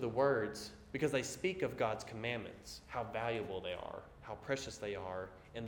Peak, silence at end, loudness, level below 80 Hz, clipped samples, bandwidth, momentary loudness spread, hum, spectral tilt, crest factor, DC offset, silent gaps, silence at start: -20 dBFS; 0 s; -40 LUFS; -64 dBFS; under 0.1%; 18 kHz; 13 LU; none; -4.5 dB/octave; 20 dB; under 0.1%; none; 0 s